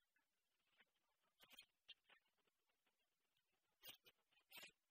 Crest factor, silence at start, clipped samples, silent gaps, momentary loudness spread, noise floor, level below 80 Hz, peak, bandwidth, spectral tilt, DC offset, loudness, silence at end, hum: 26 dB; 0 s; under 0.1%; none; 6 LU; under -90 dBFS; under -90 dBFS; -46 dBFS; 15 kHz; 0 dB/octave; under 0.1%; -65 LUFS; 0.15 s; none